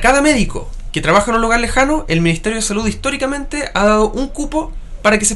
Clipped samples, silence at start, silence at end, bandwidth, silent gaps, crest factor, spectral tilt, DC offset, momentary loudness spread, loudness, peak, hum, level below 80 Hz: under 0.1%; 0 s; 0 s; 12 kHz; none; 14 dB; -4 dB/octave; under 0.1%; 9 LU; -15 LUFS; 0 dBFS; none; -26 dBFS